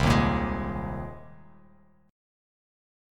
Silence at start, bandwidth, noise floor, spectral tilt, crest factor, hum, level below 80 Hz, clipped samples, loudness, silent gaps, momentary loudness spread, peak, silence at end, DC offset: 0 s; 15.5 kHz; -59 dBFS; -6.5 dB/octave; 20 dB; none; -38 dBFS; under 0.1%; -28 LUFS; none; 18 LU; -8 dBFS; 1 s; under 0.1%